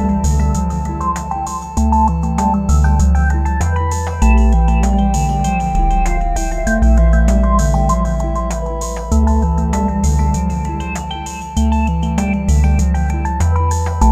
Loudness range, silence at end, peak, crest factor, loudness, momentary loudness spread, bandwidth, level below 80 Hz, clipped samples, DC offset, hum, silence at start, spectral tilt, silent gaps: 3 LU; 0 s; 0 dBFS; 12 dB; -16 LUFS; 8 LU; 14 kHz; -16 dBFS; under 0.1%; under 0.1%; none; 0 s; -6.5 dB/octave; none